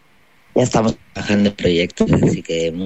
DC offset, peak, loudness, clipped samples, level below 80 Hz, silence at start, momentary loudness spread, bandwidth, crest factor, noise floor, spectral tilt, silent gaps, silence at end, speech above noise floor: 0.4%; -4 dBFS; -18 LUFS; under 0.1%; -42 dBFS; 0.55 s; 6 LU; 8.4 kHz; 14 dB; -54 dBFS; -6 dB/octave; none; 0 s; 38 dB